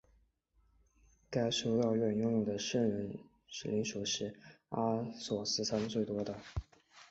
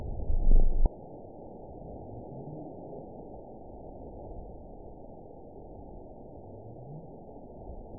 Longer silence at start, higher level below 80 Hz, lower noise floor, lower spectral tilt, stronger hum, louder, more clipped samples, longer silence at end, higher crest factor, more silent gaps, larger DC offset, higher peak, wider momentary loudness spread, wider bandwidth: first, 1.3 s vs 0 s; second, -60 dBFS vs -32 dBFS; first, -73 dBFS vs -48 dBFS; second, -5 dB/octave vs -15.5 dB/octave; neither; first, -36 LUFS vs -40 LUFS; neither; about the same, 0.05 s vs 0 s; about the same, 16 dB vs 20 dB; neither; second, under 0.1% vs 0.2%; second, -20 dBFS vs -10 dBFS; second, 12 LU vs 16 LU; first, 8 kHz vs 1 kHz